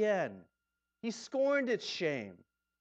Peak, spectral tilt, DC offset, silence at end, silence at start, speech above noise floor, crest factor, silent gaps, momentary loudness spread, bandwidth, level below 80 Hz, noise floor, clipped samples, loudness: -20 dBFS; -4.5 dB/octave; under 0.1%; 0.45 s; 0 s; 53 dB; 16 dB; none; 13 LU; 8.6 kHz; -84 dBFS; -87 dBFS; under 0.1%; -35 LUFS